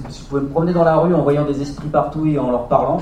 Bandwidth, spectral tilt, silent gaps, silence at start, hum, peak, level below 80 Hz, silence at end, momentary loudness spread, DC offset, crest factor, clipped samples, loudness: 9.6 kHz; -8.5 dB/octave; none; 0 s; none; 0 dBFS; -38 dBFS; 0 s; 8 LU; under 0.1%; 16 dB; under 0.1%; -17 LUFS